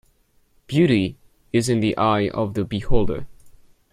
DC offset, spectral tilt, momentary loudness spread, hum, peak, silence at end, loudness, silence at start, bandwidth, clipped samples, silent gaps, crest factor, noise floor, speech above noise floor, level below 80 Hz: under 0.1%; -6.5 dB/octave; 8 LU; none; -4 dBFS; 0.45 s; -22 LUFS; 0.7 s; 14.5 kHz; under 0.1%; none; 18 dB; -60 dBFS; 42 dB; -34 dBFS